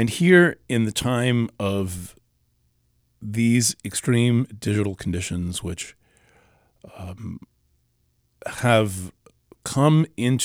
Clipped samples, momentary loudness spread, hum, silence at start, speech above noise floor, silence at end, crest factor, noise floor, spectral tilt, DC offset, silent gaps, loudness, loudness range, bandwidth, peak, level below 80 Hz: under 0.1%; 19 LU; none; 0 s; 46 dB; 0 s; 20 dB; -67 dBFS; -5 dB/octave; under 0.1%; none; -21 LUFS; 9 LU; 16.5 kHz; -4 dBFS; -52 dBFS